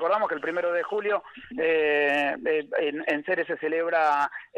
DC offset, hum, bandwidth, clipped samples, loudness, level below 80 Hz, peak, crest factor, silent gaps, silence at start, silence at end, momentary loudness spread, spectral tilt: under 0.1%; none; 9.2 kHz; under 0.1%; -25 LUFS; -68 dBFS; -12 dBFS; 12 dB; none; 0 s; 0 s; 6 LU; -5 dB/octave